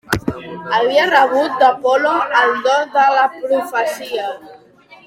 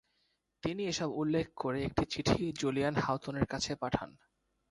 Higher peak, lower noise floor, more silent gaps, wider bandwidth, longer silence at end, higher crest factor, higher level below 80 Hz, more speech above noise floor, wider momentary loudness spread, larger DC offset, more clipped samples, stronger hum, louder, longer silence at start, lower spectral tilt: first, 0 dBFS vs -14 dBFS; second, -45 dBFS vs -78 dBFS; neither; first, 16.5 kHz vs 11.5 kHz; second, 0.1 s vs 0.6 s; about the same, 16 dB vs 20 dB; first, -48 dBFS vs -54 dBFS; second, 30 dB vs 44 dB; first, 11 LU vs 5 LU; neither; neither; neither; first, -15 LUFS vs -34 LUFS; second, 0.1 s vs 0.65 s; about the same, -4 dB/octave vs -5 dB/octave